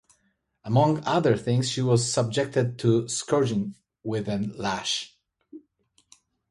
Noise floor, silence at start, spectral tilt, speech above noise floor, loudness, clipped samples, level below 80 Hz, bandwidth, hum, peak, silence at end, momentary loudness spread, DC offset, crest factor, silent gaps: -71 dBFS; 0.65 s; -5.5 dB/octave; 47 dB; -25 LUFS; under 0.1%; -60 dBFS; 11.5 kHz; none; -8 dBFS; 0.9 s; 9 LU; under 0.1%; 18 dB; none